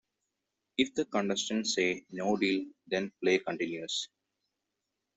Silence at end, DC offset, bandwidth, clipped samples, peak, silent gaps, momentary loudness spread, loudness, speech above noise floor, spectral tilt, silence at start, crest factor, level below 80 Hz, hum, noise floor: 1.1 s; under 0.1%; 8.2 kHz; under 0.1%; -12 dBFS; none; 6 LU; -32 LUFS; 54 dB; -3.5 dB/octave; 0.8 s; 22 dB; -74 dBFS; none; -86 dBFS